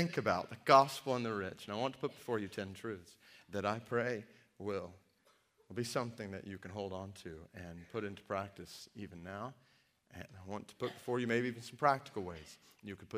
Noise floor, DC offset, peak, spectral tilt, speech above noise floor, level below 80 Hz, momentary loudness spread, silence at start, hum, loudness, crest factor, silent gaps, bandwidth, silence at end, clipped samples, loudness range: -73 dBFS; under 0.1%; -12 dBFS; -5.5 dB/octave; 34 dB; -76 dBFS; 17 LU; 0 s; none; -38 LUFS; 28 dB; none; 15.5 kHz; 0 s; under 0.1%; 11 LU